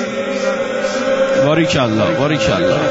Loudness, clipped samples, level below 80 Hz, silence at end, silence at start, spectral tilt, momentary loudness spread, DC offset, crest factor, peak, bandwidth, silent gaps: -15 LUFS; under 0.1%; -44 dBFS; 0 s; 0 s; -5 dB/octave; 5 LU; under 0.1%; 12 dB; -2 dBFS; 8 kHz; none